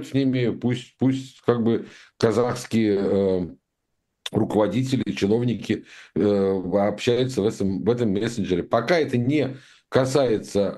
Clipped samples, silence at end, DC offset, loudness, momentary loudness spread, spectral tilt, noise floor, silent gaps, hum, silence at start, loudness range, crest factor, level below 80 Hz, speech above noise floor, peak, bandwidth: under 0.1%; 0 s; under 0.1%; -23 LUFS; 7 LU; -6.5 dB/octave; -77 dBFS; none; none; 0 s; 2 LU; 20 dB; -56 dBFS; 54 dB; -4 dBFS; 12.5 kHz